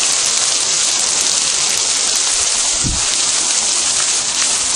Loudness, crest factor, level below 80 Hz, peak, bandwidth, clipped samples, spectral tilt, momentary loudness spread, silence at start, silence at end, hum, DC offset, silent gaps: -12 LUFS; 16 dB; -38 dBFS; 0 dBFS; over 20 kHz; under 0.1%; 1 dB/octave; 1 LU; 0 s; 0 s; none; under 0.1%; none